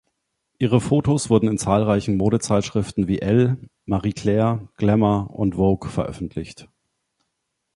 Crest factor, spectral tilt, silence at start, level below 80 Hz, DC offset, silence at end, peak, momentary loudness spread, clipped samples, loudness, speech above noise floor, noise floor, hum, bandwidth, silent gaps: 18 dB; -7 dB/octave; 0.6 s; -44 dBFS; under 0.1%; 1.1 s; -2 dBFS; 9 LU; under 0.1%; -21 LUFS; 57 dB; -77 dBFS; none; 11.5 kHz; none